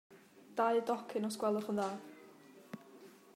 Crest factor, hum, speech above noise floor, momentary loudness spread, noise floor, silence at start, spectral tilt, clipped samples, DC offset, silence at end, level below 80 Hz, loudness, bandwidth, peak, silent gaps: 20 dB; none; 23 dB; 24 LU; -59 dBFS; 0.1 s; -5.5 dB/octave; under 0.1%; under 0.1%; 0.25 s; -88 dBFS; -36 LUFS; 16 kHz; -20 dBFS; none